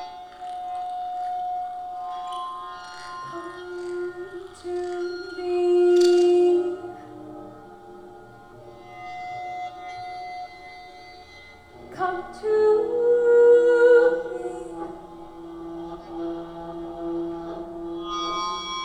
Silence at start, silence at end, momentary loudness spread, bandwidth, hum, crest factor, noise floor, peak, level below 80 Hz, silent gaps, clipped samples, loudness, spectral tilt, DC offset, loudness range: 0 s; 0 s; 25 LU; 9.8 kHz; none; 18 dB; -47 dBFS; -6 dBFS; -58 dBFS; none; under 0.1%; -23 LUFS; -5 dB/octave; 0.1%; 17 LU